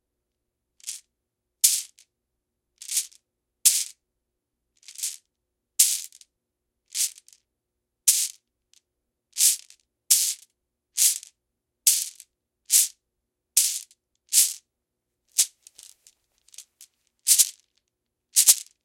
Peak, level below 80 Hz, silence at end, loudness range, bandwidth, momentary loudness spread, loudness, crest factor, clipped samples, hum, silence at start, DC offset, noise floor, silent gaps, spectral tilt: 0 dBFS; -84 dBFS; 0.25 s; 5 LU; 17 kHz; 19 LU; -21 LUFS; 28 dB; under 0.1%; 60 Hz at -95 dBFS; 0.85 s; under 0.1%; -82 dBFS; none; 6.5 dB/octave